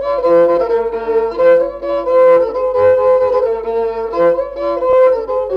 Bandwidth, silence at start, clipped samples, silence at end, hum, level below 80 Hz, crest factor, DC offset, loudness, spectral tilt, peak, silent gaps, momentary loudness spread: 5.4 kHz; 0 s; under 0.1%; 0 s; none; -44 dBFS; 10 dB; under 0.1%; -13 LUFS; -7 dB/octave; -2 dBFS; none; 7 LU